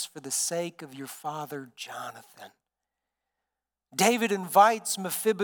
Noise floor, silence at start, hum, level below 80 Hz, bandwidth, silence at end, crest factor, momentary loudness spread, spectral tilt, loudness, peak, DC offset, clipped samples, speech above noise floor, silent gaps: -88 dBFS; 0 s; 60 Hz at -70 dBFS; under -90 dBFS; 19 kHz; 0 s; 24 dB; 19 LU; -2.5 dB/octave; -26 LUFS; -6 dBFS; under 0.1%; under 0.1%; 60 dB; none